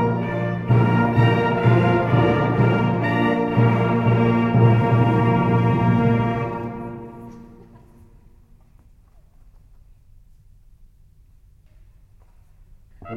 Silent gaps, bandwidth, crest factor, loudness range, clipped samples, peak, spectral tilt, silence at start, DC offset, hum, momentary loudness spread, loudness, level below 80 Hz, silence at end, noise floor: none; 4.9 kHz; 16 dB; 10 LU; under 0.1%; -4 dBFS; -9.5 dB/octave; 0 s; under 0.1%; none; 12 LU; -19 LUFS; -44 dBFS; 0 s; -51 dBFS